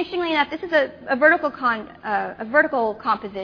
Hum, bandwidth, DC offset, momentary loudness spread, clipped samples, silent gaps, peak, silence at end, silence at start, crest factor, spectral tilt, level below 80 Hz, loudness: none; 5.4 kHz; under 0.1%; 9 LU; under 0.1%; none; -4 dBFS; 0 s; 0 s; 18 dB; -6 dB/octave; -58 dBFS; -21 LUFS